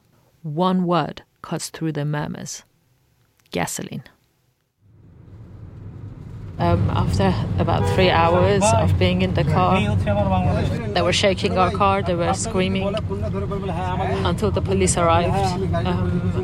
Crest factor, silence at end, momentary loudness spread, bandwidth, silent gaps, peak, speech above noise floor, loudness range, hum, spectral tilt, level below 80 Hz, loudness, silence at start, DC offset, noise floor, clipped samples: 18 dB; 0 s; 17 LU; 14.5 kHz; none; -4 dBFS; 46 dB; 14 LU; none; -5.5 dB/octave; -36 dBFS; -20 LUFS; 0.45 s; under 0.1%; -66 dBFS; under 0.1%